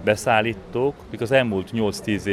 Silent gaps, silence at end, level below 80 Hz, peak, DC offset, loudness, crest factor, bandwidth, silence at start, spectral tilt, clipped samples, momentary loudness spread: none; 0 s; -50 dBFS; -4 dBFS; under 0.1%; -22 LUFS; 18 dB; 15 kHz; 0 s; -5.5 dB/octave; under 0.1%; 7 LU